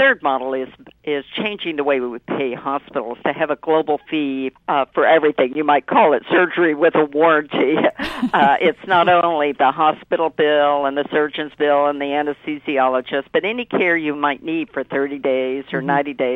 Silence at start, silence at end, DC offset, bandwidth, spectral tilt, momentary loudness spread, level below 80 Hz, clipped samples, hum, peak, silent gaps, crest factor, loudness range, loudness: 0 s; 0 s; under 0.1%; 6 kHz; -7 dB/octave; 9 LU; -58 dBFS; under 0.1%; none; -2 dBFS; none; 16 dB; 6 LU; -18 LUFS